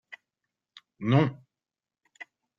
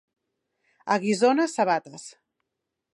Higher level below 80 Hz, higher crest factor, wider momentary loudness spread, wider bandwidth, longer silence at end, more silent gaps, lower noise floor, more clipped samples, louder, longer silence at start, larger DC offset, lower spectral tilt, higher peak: first, -68 dBFS vs -80 dBFS; about the same, 22 dB vs 18 dB; first, 25 LU vs 21 LU; second, 7 kHz vs 11.5 kHz; second, 0.35 s vs 0.85 s; neither; first, under -90 dBFS vs -83 dBFS; neither; about the same, -26 LUFS vs -24 LUFS; second, 0.1 s vs 0.85 s; neither; first, -8.5 dB/octave vs -4.5 dB/octave; about the same, -10 dBFS vs -8 dBFS